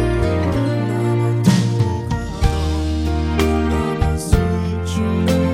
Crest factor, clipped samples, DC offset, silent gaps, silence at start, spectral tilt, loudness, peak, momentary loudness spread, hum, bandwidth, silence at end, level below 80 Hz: 18 dB; under 0.1%; under 0.1%; none; 0 s; -7 dB/octave; -19 LUFS; 0 dBFS; 5 LU; none; 16 kHz; 0 s; -24 dBFS